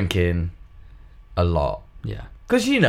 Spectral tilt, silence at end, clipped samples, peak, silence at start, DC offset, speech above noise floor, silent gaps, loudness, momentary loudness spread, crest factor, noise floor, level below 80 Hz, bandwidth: -6 dB/octave; 0 s; under 0.1%; -4 dBFS; 0 s; under 0.1%; 24 dB; none; -24 LUFS; 12 LU; 20 dB; -44 dBFS; -36 dBFS; 15 kHz